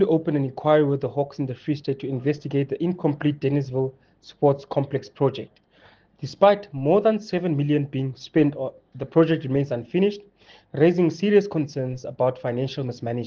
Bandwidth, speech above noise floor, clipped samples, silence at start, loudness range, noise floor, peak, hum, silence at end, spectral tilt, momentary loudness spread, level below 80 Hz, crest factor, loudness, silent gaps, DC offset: 7 kHz; 33 dB; under 0.1%; 0 s; 3 LU; -56 dBFS; -4 dBFS; none; 0 s; -8 dB/octave; 10 LU; -62 dBFS; 20 dB; -23 LUFS; none; under 0.1%